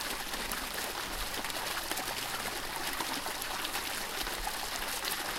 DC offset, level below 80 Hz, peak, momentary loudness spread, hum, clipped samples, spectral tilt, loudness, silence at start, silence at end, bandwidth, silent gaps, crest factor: under 0.1%; -50 dBFS; -16 dBFS; 2 LU; none; under 0.1%; -1 dB/octave; -35 LUFS; 0 s; 0 s; 17 kHz; none; 20 dB